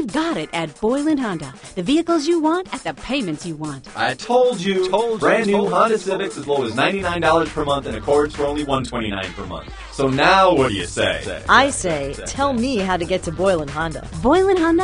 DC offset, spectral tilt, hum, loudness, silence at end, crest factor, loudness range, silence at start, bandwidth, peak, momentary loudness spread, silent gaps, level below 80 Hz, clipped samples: under 0.1%; -4.5 dB/octave; none; -19 LUFS; 0 s; 20 dB; 4 LU; 0 s; 10.5 kHz; 0 dBFS; 11 LU; none; -40 dBFS; under 0.1%